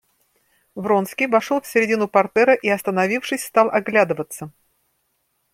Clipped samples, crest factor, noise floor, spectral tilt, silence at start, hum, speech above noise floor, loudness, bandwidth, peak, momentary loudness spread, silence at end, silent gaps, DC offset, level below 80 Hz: under 0.1%; 18 dB; -70 dBFS; -5 dB/octave; 0.75 s; none; 51 dB; -19 LUFS; 16.5 kHz; -2 dBFS; 14 LU; 1.05 s; none; under 0.1%; -66 dBFS